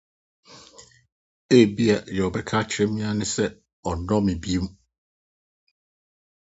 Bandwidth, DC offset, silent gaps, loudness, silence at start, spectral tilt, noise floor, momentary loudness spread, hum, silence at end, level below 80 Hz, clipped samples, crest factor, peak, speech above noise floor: 8.2 kHz; under 0.1%; 1.12-1.49 s, 3.73-3.83 s; -23 LUFS; 0.5 s; -5.5 dB/octave; -51 dBFS; 12 LU; none; 1.75 s; -46 dBFS; under 0.1%; 22 dB; -4 dBFS; 29 dB